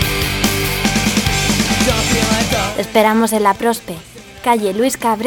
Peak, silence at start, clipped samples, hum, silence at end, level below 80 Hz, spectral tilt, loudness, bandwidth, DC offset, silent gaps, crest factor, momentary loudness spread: 0 dBFS; 0 s; under 0.1%; none; 0 s; -30 dBFS; -3.5 dB/octave; -15 LUFS; 19 kHz; under 0.1%; none; 16 dB; 5 LU